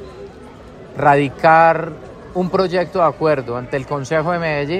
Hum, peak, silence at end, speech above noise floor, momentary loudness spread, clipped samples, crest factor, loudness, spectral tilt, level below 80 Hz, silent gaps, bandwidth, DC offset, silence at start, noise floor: none; 0 dBFS; 0 s; 22 dB; 21 LU; under 0.1%; 16 dB; -16 LUFS; -6.5 dB/octave; -46 dBFS; none; 10 kHz; under 0.1%; 0 s; -38 dBFS